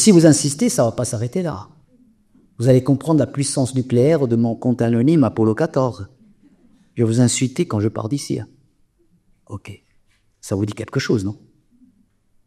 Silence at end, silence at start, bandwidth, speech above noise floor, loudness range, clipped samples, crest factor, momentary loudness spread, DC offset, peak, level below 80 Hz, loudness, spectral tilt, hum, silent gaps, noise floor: 1.1 s; 0 s; 14.5 kHz; 42 dB; 10 LU; under 0.1%; 20 dB; 19 LU; under 0.1%; 0 dBFS; -54 dBFS; -18 LUFS; -6 dB/octave; none; none; -59 dBFS